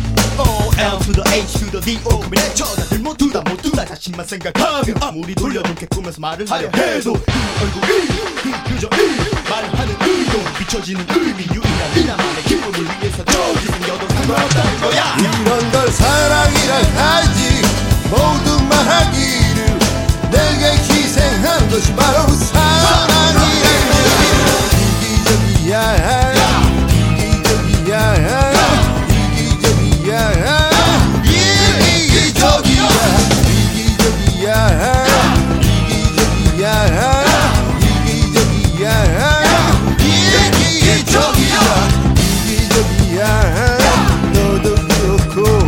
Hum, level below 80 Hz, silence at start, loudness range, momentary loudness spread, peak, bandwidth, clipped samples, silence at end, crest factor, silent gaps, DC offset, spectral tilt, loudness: none; -20 dBFS; 0 s; 7 LU; 8 LU; 0 dBFS; 17 kHz; under 0.1%; 0 s; 12 dB; none; under 0.1%; -4.5 dB/octave; -13 LUFS